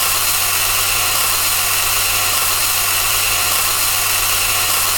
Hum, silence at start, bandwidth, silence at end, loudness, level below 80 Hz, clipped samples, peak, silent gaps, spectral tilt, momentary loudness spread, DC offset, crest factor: none; 0 s; 17.5 kHz; 0 s; -13 LUFS; -38 dBFS; under 0.1%; 0 dBFS; none; 0.5 dB/octave; 0 LU; under 0.1%; 16 dB